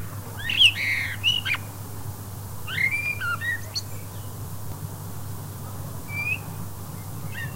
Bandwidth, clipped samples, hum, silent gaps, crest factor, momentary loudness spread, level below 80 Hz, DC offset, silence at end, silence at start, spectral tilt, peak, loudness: 16 kHz; under 0.1%; none; none; 22 dB; 17 LU; -50 dBFS; 0.8%; 0 s; 0 s; -2.5 dB/octave; -6 dBFS; -25 LUFS